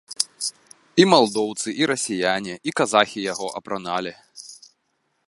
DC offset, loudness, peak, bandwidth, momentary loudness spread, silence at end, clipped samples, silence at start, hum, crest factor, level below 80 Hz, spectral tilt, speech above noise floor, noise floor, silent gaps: under 0.1%; -22 LUFS; 0 dBFS; 12 kHz; 17 LU; 0.75 s; under 0.1%; 0.1 s; none; 24 dB; -66 dBFS; -3.5 dB/octave; 50 dB; -71 dBFS; none